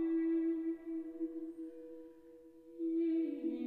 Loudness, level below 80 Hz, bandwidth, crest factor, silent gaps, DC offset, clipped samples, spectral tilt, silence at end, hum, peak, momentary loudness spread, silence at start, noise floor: -38 LUFS; -76 dBFS; 3.9 kHz; 10 dB; none; under 0.1%; under 0.1%; -7.5 dB/octave; 0 s; none; -28 dBFS; 22 LU; 0 s; -58 dBFS